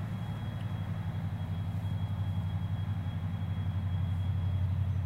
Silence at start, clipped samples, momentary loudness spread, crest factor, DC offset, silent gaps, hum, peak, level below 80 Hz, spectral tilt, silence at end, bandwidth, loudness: 0 s; under 0.1%; 5 LU; 12 dB; under 0.1%; none; none; -22 dBFS; -50 dBFS; -8.5 dB/octave; 0 s; 4.9 kHz; -35 LUFS